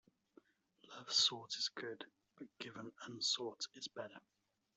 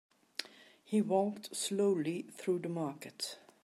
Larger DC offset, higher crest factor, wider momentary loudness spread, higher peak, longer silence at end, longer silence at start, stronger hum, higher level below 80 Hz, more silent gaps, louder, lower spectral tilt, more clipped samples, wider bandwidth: neither; first, 24 dB vs 18 dB; first, 23 LU vs 12 LU; second, -22 dBFS vs -18 dBFS; first, 0.55 s vs 0.25 s; first, 0.85 s vs 0.4 s; neither; about the same, under -90 dBFS vs -88 dBFS; neither; second, -39 LUFS vs -36 LUFS; second, -1 dB/octave vs -5 dB/octave; neither; second, 8.2 kHz vs 15 kHz